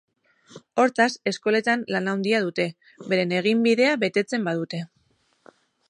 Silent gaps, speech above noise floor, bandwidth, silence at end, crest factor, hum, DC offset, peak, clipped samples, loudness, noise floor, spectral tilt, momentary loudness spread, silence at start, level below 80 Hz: none; 43 dB; 11 kHz; 1.05 s; 18 dB; none; under 0.1%; -6 dBFS; under 0.1%; -23 LUFS; -66 dBFS; -5 dB/octave; 10 LU; 0.5 s; -76 dBFS